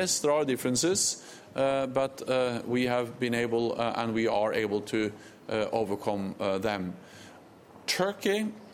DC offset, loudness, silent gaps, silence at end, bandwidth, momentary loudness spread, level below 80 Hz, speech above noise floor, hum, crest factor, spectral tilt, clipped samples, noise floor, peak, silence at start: under 0.1%; -29 LUFS; none; 0 s; 16.5 kHz; 9 LU; -64 dBFS; 23 dB; none; 16 dB; -3.5 dB/octave; under 0.1%; -52 dBFS; -12 dBFS; 0 s